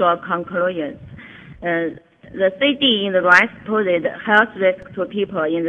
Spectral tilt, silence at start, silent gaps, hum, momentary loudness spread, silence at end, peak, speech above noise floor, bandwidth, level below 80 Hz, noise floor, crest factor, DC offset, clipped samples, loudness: -5 dB/octave; 0 s; none; none; 15 LU; 0 s; 0 dBFS; 21 dB; 9.2 kHz; -56 dBFS; -39 dBFS; 18 dB; under 0.1%; under 0.1%; -18 LUFS